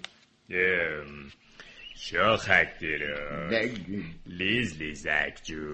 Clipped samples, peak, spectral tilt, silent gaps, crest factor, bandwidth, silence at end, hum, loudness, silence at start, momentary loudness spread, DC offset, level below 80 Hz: under 0.1%; -6 dBFS; -4.5 dB/octave; none; 24 dB; 8.8 kHz; 0 s; none; -28 LUFS; 0.05 s; 21 LU; under 0.1%; -52 dBFS